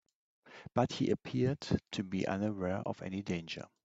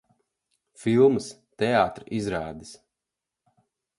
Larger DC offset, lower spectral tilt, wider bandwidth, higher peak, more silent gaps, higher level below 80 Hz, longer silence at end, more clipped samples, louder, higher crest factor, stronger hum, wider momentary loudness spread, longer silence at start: neither; about the same, -6.5 dB/octave vs -6 dB/octave; second, 8 kHz vs 11.5 kHz; second, -14 dBFS vs -8 dBFS; neither; second, -64 dBFS vs -58 dBFS; second, 0.2 s vs 1.25 s; neither; second, -36 LUFS vs -24 LUFS; about the same, 22 dB vs 20 dB; neither; second, 7 LU vs 17 LU; second, 0.45 s vs 0.8 s